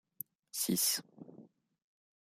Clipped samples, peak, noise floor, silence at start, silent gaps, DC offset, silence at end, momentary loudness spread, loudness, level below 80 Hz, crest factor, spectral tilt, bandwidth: under 0.1%; -18 dBFS; -60 dBFS; 0.55 s; none; under 0.1%; 0.8 s; 25 LU; -33 LUFS; -80 dBFS; 22 dB; -2 dB/octave; 16 kHz